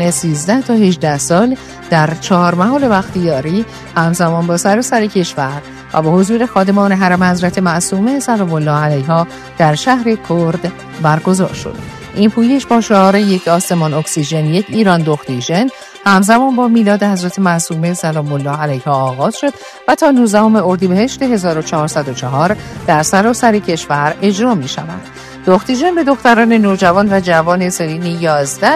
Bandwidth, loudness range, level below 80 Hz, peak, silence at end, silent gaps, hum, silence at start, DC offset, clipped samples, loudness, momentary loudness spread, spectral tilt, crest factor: 14 kHz; 2 LU; -46 dBFS; 0 dBFS; 0 s; none; none; 0 s; under 0.1%; 0.2%; -12 LUFS; 8 LU; -5.5 dB/octave; 12 dB